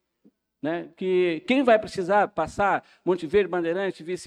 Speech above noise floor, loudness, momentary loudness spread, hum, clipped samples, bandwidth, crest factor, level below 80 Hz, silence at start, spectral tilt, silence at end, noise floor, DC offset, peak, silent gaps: 39 dB; -24 LUFS; 10 LU; none; under 0.1%; 10.5 kHz; 16 dB; -56 dBFS; 0.65 s; -6 dB/octave; 0 s; -63 dBFS; under 0.1%; -8 dBFS; none